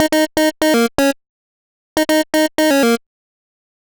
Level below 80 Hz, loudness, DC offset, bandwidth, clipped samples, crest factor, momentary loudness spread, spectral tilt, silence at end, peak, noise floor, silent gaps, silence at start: -48 dBFS; -15 LUFS; under 0.1%; over 20 kHz; under 0.1%; 16 dB; 7 LU; -3 dB/octave; 0.95 s; 0 dBFS; under -90 dBFS; 1.29-1.96 s; 0 s